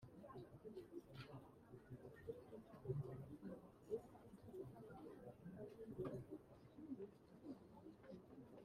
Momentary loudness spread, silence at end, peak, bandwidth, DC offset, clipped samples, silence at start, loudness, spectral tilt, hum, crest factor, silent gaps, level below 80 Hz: 11 LU; 0 s; -34 dBFS; 15 kHz; under 0.1%; under 0.1%; 0 s; -57 LUFS; -8.5 dB/octave; none; 22 dB; none; -76 dBFS